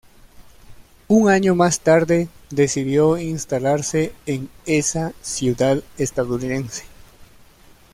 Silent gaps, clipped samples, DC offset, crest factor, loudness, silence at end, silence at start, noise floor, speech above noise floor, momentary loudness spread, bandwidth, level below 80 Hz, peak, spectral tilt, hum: none; under 0.1%; under 0.1%; 18 dB; -19 LUFS; 0.7 s; 0.4 s; -49 dBFS; 30 dB; 10 LU; 16 kHz; -48 dBFS; -4 dBFS; -5 dB/octave; none